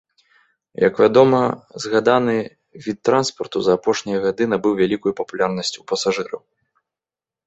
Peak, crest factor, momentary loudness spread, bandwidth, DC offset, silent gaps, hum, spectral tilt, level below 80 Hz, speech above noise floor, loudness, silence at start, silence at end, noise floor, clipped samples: -2 dBFS; 18 dB; 14 LU; 8.2 kHz; under 0.1%; none; none; -5 dB/octave; -60 dBFS; over 72 dB; -19 LUFS; 0.8 s; 1.1 s; under -90 dBFS; under 0.1%